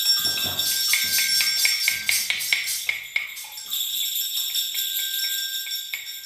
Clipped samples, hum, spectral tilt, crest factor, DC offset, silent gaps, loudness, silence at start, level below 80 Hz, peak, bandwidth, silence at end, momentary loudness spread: under 0.1%; none; 2.5 dB/octave; 22 dB; under 0.1%; none; -22 LUFS; 0 s; -68 dBFS; -4 dBFS; 16 kHz; 0 s; 9 LU